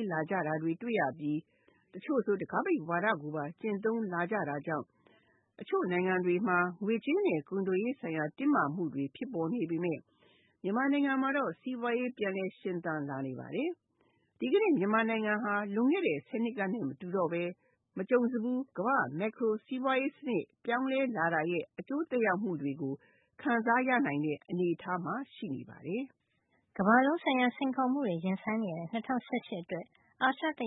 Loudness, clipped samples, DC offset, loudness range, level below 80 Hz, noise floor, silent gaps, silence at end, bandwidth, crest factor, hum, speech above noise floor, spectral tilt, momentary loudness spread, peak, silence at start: -33 LUFS; under 0.1%; under 0.1%; 3 LU; -80 dBFS; -75 dBFS; none; 0 s; 4 kHz; 22 dB; none; 43 dB; -10 dB/octave; 10 LU; -12 dBFS; 0 s